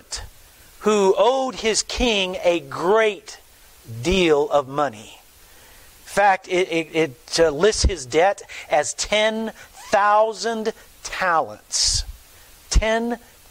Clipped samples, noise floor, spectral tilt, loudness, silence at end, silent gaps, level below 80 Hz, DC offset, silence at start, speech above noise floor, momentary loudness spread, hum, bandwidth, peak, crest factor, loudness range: under 0.1%; -48 dBFS; -3 dB/octave; -20 LUFS; 0.35 s; none; -34 dBFS; under 0.1%; 0.1 s; 28 dB; 14 LU; none; 16 kHz; -6 dBFS; 16 dB; 2 LU